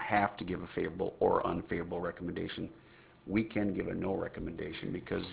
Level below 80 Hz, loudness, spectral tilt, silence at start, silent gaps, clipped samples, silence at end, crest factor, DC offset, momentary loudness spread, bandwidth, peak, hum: -56 dBFS; -35 LUFS; -5 dB/octave; 0 s; none; under 0.1%; 0 s; 20 dB; under 0.1%; 9 LU; 4 kHz; -14 dBFS; none